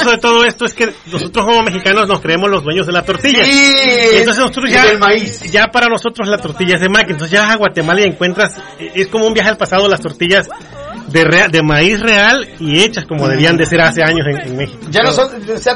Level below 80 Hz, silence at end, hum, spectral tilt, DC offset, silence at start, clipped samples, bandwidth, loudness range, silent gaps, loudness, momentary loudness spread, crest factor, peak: -38 dBFS; 0 s; none; -4 dB/octave; under 0.1%; 0 s; under 0.1%; 11 kHz; 4 LU; none; -10 LUFS; 9 LU; 12 dB; 0 dBFS